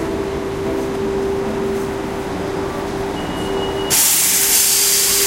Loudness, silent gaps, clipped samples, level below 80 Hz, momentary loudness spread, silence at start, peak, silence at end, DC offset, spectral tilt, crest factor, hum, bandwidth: -16 LUFS; none; under 0.1%; -38 dBFS; 12 LU; 0 s; 0 dBFS; 0 s; under 0.1%; -2 dB/octave; 18 dB; none; 16 kHz